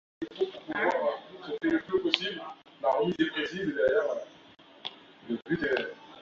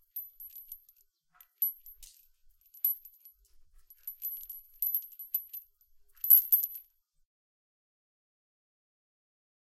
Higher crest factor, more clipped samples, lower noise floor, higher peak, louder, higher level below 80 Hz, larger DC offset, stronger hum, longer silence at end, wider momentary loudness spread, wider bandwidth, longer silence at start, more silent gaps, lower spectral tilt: about the same, 28 dB vs 28 dB; neither; second, -55 dBFS vs -68 dBFS; first, -2 dBFS vs -8 dBFS; about the same, -30 LUFS vs -28 LUFS; about the same, -66 dBFS vs -70 dBFS; neither; neither; second, 0 s vs 2.9 s; second, 15 LU vs 25 LU; second, 7.6 kHz vs 16 kHz; about the same, 0.2 s vs 0.15 s; neither; first, -5.5 dB/octave vs 2 dB/octave